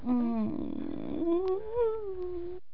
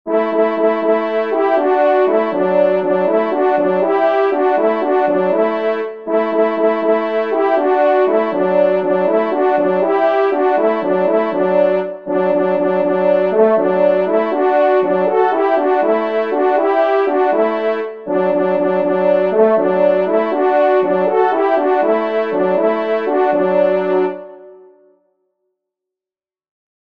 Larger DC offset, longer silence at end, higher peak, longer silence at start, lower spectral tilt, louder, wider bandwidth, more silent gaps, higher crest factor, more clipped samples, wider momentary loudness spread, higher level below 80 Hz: first, 1% vs 0.4%; second, 0.15 s vs 2.3 s; second, -20 dBFS vs 0 dBFS; about the same, 0 s vs 0.05 s; first, -10.5 dB/octave vs -8.5 dB/octave; second, -33 LUFS vs -15 LUFS; about the same, 5.4 kHz vs 5.4 kHz; neither; about the same, 12 dB vs 14 dB; neither; first, 8 LU vs 4 LU; first, -54 dBFS vs -68 dBFS